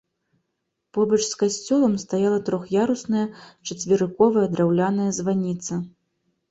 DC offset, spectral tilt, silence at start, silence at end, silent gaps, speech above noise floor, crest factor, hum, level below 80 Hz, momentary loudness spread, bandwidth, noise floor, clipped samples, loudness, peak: under 0.1%; -5.5 dB/octave; 0.95 s; 0.6 s; none; 56 dB; 18 dB; none; -62 dBFS; 12 LU; 8.2 kHz; -78 dBFS; under 0.1%; -22 LUFS; -4 dBFS